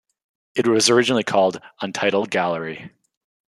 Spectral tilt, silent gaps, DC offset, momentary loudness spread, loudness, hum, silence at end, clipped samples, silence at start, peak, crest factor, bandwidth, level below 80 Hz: -3.5 dB/octave; none; under 0.1%; 14 LU; -20 LUFS; none; 0.6 s; under 0.1%; 0.55 s; -2 dBFS; 20 dB; 13 kHz; -68 dBFS